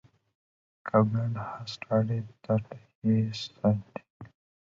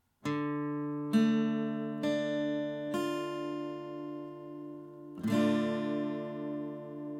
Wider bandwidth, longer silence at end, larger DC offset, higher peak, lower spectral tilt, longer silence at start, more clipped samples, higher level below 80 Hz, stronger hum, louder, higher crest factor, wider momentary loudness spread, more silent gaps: second, 7.6 kHz vs 14 kHz; first, 0.4 s vs 0 s; neither; first, -10 dBFS vs -16 dBFS; first, -8 dB/octave vs -6.5 dB/octave; first, 0.85 s vs 0.25 s; neither; first, -62 dBFS vs -80 dBFS; neither; first, -29 LUFS vs -34 LUFS; about the same, 20 dB vs 16 dB; about the same, 16 LU vs 15 LU; first, 2.95-3.02 s, 4.10-4.20 s vs none